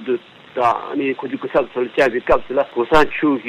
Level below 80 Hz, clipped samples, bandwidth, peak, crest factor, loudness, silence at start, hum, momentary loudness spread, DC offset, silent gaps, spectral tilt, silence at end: -42 dBFS; under 0.1%; 14 kHz; -2 dBFS; 16 dB; -18 LUFS; 0 s; none; 9 LU; under 0.1%; none; -6 dB/octave; 0 s